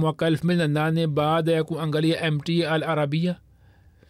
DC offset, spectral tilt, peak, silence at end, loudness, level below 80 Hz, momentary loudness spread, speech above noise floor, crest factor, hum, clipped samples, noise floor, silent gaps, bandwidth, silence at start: under 0.1%; -7 dB/octave; -12 dBFS; 0.75 s; -23 LUFS; -60 dBFS; 3 LU; 32 dB; 10 dB; none; under 0.1%; -54 dBFS; none; 13.5 kHz; 0 s